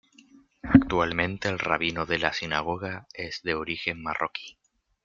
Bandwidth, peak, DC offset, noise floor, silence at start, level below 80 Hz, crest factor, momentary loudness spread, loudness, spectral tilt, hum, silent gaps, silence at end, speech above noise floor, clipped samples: 7.2 kHz; -2 dBFS; under 0.1%; -56 dBFS; 0.65 s; -50 dBFS; 26 dB; 15 LU; -27 LUFS; -5.5 dB/octave; none; none; 0.55 s; 27 dB; under 0.1%